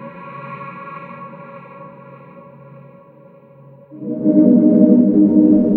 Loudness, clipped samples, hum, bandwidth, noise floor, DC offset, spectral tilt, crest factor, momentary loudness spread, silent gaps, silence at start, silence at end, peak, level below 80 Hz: -12 LUFS; under 0.1%; none; 2.9 kHz; -44 dBFS; under 0.1%; -13 dB/octave; 16 dB; 25 LU; none; 0 s; 0 s; 0 dBFS; -56 dBFS